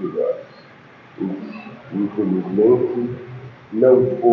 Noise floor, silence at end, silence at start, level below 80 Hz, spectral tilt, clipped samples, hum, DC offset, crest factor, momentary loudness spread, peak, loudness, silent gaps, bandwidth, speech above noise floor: -45 dBFS; 0 s; 0 s; -60 dBFS; -11 dB/octave; under 0.1%; none; under 0.1%; 18 dB; 19 LU; -2 dBFS; -19 LUFS; none; 4.9 kHz; 28 dB